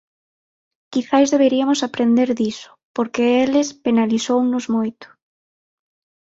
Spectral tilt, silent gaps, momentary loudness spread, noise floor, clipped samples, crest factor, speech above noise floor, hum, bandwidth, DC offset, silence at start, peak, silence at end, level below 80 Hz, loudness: -4.5 dB/octave; 2.83-2.95 s; 10 LU; under -90 dBFS; under 0.1%; 16 dB; over 73 dB; none; 8 kHz; under 0.1%; 0.9 s; -2 dBFS; 1.25 s; -62 dBFS; -18 LUFS